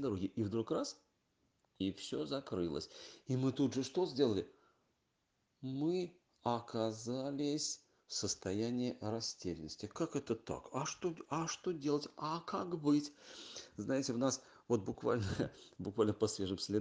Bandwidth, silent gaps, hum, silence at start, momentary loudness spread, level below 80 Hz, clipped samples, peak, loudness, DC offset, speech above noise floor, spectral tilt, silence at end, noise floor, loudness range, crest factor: 10 kHz; none; none; 0 s; 11 LU; -72 dBFS; under 0.1%; -20 dBFS; -39 LUFS; under 0.1%; 44 dB; -5 dB/octave; 0 s; -82 dBFS; 3 LU; 20 dB